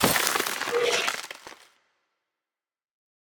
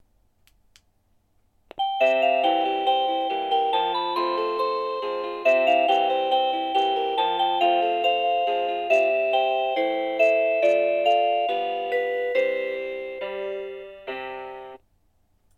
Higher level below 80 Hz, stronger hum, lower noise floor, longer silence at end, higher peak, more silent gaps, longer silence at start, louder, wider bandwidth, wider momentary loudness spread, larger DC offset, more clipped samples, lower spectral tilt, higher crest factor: first, -62 dBFS vs -68 dBFS; neither; first, under -90 dBFS vs -65 dBFS; first, 1.8 s vs 0.8 s; first, -4 dBFS vs -8 dBFS; neither; second, 0 s vs 1.75 s; about the same, -25 LUFS vs -23 LUFS; first, over 20 kHz vs 12.5 kHz; first, 16 LU vs 12 LU; neither; neither; second, -1.5 dB/octave vs -3.5 dB/octave; first, 26 dB vs 16 dB